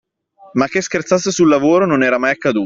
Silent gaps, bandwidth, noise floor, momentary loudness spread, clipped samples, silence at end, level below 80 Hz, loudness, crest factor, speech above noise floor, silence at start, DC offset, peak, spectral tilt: none; 7.8 kHz; -47 dBFS; 6 LU; under 0.1%; 0 s; -56 dBFS; -15 LUFS; 14 dB; 33 dB; 0.55 s; under 0.1%; -2 dBFS; -5 dB/octave